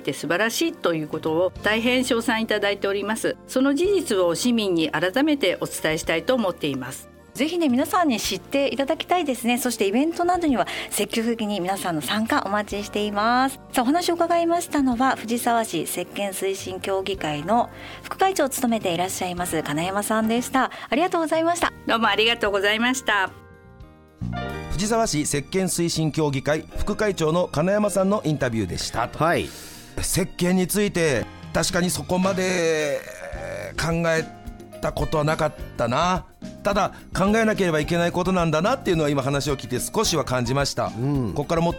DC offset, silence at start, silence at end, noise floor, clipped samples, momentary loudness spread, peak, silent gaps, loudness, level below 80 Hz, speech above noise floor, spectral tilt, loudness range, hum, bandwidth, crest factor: under 0.1%; 0 s; 0 s; -46 dBFS; under 0.1%; 7 LU; -8 dBFS; none; -23 LUFS; -42 dBFS; 24 dB; -4.5 dB/octave; 3 LU; none; 17.5 kHz; 16 dB